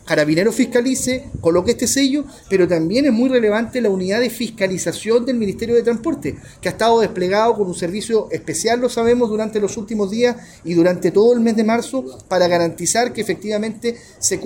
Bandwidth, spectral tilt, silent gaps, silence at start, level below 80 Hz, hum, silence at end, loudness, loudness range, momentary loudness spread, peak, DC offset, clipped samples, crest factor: 17 kHz; -4.5 dB/octave; none; 0.05 s; -48 dBFS; none; 0 s; -18 LUFS; 2 LU; 8 LU; -4 dBFS; under 0.1%; under 0.1%; 14 dB